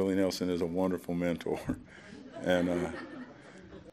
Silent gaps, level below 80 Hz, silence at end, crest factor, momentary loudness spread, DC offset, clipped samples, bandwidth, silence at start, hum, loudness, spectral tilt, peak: none; -60 dBFS; 0 s; 20 dB; 20 LU; under 0.1%; under 0.1%; 15.5 kHz; 0 s; none; -33 LUFS; -6 dB/octave; -14 dBFS